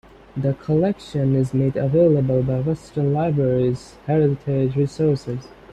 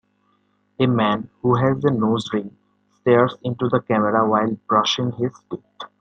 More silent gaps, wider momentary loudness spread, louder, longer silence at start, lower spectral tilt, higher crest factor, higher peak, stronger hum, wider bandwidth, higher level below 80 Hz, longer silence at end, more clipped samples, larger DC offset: neither; about the same, 8 LU vs 10 LU; about the same, -21 LUFS vs -20 LUFS; second, 0.35 s vs 0.8 s; first, -9 dB/octave vs -6.5 dB/octave; about the same, 14 dB vs 18 dB; second, -6 dBFS vs -2 dBFS; neither; about the same, 9 kHz vs 9 kHz; first, -48 dBFS vs -60 dBFS; about the same, 0.25 s vs 0.15 s; neither; neither